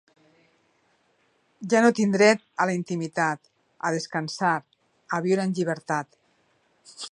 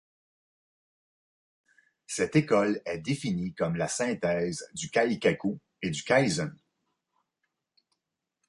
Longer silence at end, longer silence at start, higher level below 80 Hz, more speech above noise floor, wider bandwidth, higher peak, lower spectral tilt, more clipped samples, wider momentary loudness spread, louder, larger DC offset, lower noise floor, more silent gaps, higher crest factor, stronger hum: second, 0.05 s vs 1.95 s; second, 1.6 s vs 2.1 s; second, -76 dBFS vs -62 dBFS; second, 43 dB vs 57 dB; about the same, 11 kHz vs 11.5 kHz; first, -4 dBFS vs -10 dBFS; about the same, -5 dB/octave vs -5 dB/octave; neither; about the same, 12 LU vs 10 LU; first, -24 LUFS vs -29 LUFS; neither; second, -67 dBFS vs -85 dBFS; neither; about the same, 22 dB vs 22 dB; neither